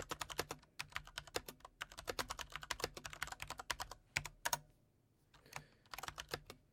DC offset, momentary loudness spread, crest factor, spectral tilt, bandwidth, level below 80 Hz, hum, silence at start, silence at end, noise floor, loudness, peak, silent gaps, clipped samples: under 0.1%; 11 LU; 30 dB; -1.5 dB/octave; 16.5 kHz; -64 dBFS; none; 0 s; 0.1 s; -75 dBFS; -46 LUFS; -18 dBFS; none; under 0.1%